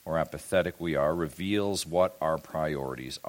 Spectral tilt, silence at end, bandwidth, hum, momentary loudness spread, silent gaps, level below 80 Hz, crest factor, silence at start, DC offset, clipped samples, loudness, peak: -5 dB/octave; 0 s; 17 kHz; none; 5 LU; none; -54 dBFS; 18 dB; 0.05 s; under 0.1%; under 0.1%; -29 LUFS; -12 dBFS